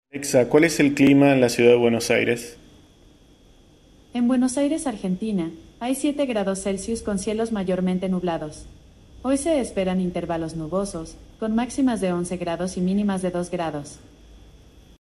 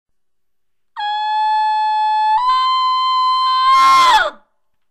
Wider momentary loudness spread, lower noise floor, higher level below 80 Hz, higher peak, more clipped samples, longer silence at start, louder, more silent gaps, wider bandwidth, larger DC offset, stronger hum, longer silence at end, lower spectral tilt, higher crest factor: first, 14 LU vs 10 LU; second, -53 dBFS vs -80 dBFS; first, -48 dBFS vs -54 dBFS; first, -2 dBFS vs -6 dBFS; neither; second, 0.15 s vs 0.95 s; second, -22 LUFS vs -14 LUFS; neither; second, 13.5 kHz vs 15.5 kHz; neither; neither; about the same, 0.65 s vs 0.55 s; first, -5.5 dB/octave vs 1 dB/octave; first, 20 dB vs 10 dB